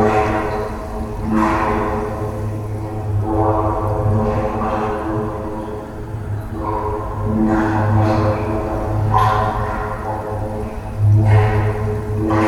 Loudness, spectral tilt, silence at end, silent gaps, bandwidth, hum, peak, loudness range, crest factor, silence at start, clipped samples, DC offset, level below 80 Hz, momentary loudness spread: -19 LUFS; -8.5 dB/octave; 0 s; none; 11.5 kHz; none; -2 dBFS; 4 LU; 16 dB; 0 s; under 0.1%; under 0.1%; -30 dBFS; 11 LU